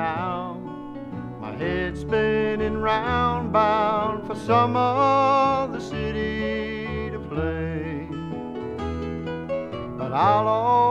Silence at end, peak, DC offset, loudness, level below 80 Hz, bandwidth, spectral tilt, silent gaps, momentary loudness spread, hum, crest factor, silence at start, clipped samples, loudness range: 0 s; -6 dBFS; under 0.1%; -24 LUFS; -42 dBFS; 10 kHz; -7 dB/octave; none; 13 LU; none; 16 dB; 0 s; under 0.1%; 8 LU